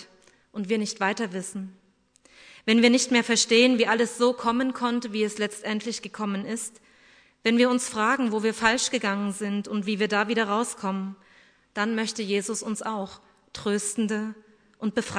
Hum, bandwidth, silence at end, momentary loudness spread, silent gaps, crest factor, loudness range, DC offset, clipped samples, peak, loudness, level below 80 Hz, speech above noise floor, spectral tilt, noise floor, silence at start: none; 11 kHz; 0 s; 13 LU; none; 22 dB; 7 LU; under 0.1%; under 0.1%; -4 dBFS; -25 LUFS; -66 dBFS; 37 dB; -3.5 dB/octave; -62 dBFS; 0 s